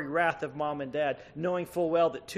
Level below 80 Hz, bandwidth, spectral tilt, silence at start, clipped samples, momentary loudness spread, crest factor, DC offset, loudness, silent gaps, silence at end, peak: -66 dBFS; 14 kHz; -6 dB/octave; 0 s; under 0.1%; 7 LU; 18 dB; under 0.1%; -30 LUFS; none; 0 s; -12 dBFS